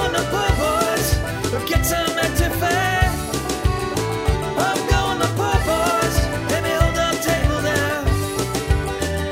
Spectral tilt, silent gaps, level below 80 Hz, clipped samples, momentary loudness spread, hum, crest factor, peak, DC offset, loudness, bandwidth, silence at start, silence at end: -4.5 dB/octave; none; -26 dBFS; under 0.1%; 4 LU; none; 18 dB; -2 dBFS; under 0.1%; -20 LUFS; 16.5 kHz; 0 s; 0 s